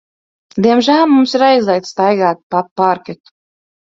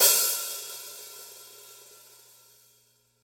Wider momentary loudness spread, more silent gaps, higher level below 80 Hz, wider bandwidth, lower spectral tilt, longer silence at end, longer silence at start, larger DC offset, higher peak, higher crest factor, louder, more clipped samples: second, 9 LU vs 26 LU; first, 2.43-2.50 s, 2.71-2.76 s vs none; first, -58 dBFS vs -84 dBFS; second, 7.6 kHz vs 17.5 kHz; first, -5.5 dB/octave vs 3 dB/octave; second, 0.85 s vs 1.5 s; first, 0.55 s vs 0 s; neither; first, 0 dBFS vs -6 dBFS; second, 14 dB vs 24 dB; first, -13 LUFS vs -26 LUFS; neither